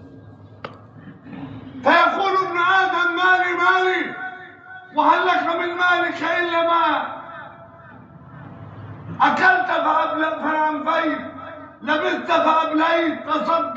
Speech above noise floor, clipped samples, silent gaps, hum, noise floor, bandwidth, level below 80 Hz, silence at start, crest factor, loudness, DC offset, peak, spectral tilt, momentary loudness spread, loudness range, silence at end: 24 dB; under 0.1%; none; none; -43 dBFS; 7.8 kHz; -64 dBFS; 0 s; 18 dB; -19 LUFS; under 0.1%; -2 dBFS; -5 dB/octave; 22 LU; 4 LU; 0 s